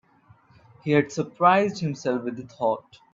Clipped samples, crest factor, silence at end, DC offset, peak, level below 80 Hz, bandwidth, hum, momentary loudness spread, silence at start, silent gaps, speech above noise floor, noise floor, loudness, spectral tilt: under 0.1%; 20 dB; 0.35 s; under 0.1%; -6 dBFS; -68 dBFS; 7.6 kHz; none; 13 LU; 0.85 s; none; 33 dB; -57 dBFS; -24 LUFS; -6.5 dB/octave